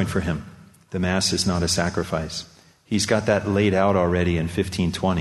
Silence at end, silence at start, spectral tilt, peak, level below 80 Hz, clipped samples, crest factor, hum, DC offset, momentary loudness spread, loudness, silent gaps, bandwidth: 0 s; 0 s; -5 dB/octave; -4 dBFS; -42 dBFS; under 0.1%; 18 dB; none; under 0.1%; 9 LU; -22 LUFS; none; 12.5 kHz